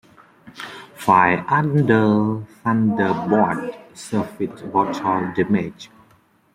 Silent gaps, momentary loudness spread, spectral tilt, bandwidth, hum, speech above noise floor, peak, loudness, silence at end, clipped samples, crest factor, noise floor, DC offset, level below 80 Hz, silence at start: none; 16 LU; -7.5 dB/octave; 15 kHz; none; 38 dB; -2 dBFS; -19 LUFS; 0.7 s; under 0.1%; 20 dB; -57 dBFS; under 0.1%; -58 dBFS; 0.45 s